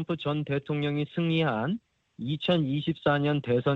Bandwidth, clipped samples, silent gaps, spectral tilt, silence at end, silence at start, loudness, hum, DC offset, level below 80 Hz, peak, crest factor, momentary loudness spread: 5.6 kHz; under 0.1%; none; -8.5 dB/octave; 0 s; 0 s; -28 LUFS; none; under 0.1%; -62 dBFS; -10 dBFS; 16 dB; 6 LU